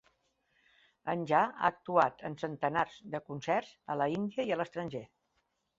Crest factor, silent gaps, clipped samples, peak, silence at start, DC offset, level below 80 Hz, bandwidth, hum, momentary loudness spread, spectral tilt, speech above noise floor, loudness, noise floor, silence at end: 22 dB; none; under 0.1%; -12 dBFS; 1.05 s; under 0.1%; -72 dBFS; 7.8 kHz; none; 11 LU; -6.5 dB/octave; 46 dB; -33 LUFS; -79 dBFS; 0.75 s